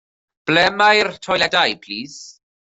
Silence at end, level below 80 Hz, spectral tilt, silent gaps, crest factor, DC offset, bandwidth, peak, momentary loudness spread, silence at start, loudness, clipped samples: 0.4 s; -56 dBFS; -3 dB/octave; none; 18 dB; under 0.1%; 8.2 kHz; -2 dBFS; 16 LU; 0.45 s; -16 LUFS; under 0.1%